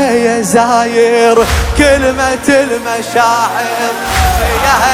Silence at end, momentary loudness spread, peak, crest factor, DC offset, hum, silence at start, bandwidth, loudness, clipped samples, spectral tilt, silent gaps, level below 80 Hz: 0 s; 6 LU; 0 dBFS; 10 dB; under 0.1%; none; 0 s; 17.5 kHz; -10 LUFS; 0.2%; -4 dB/octave; none; -22 dBFS